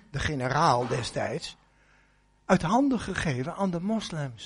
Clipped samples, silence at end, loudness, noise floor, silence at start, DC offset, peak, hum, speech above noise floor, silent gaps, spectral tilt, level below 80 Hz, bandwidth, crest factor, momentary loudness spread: under 0.1%; 0 s; -27 LUFS; -63 dBFS; 0.15 s; under 0.1%; -8 dBFS; 50 Hz at -55 dBFS; 36 dB; none; -5.5 dB/octave; -50 dBFS; 10.5 kHz; 20 dB; 10 LU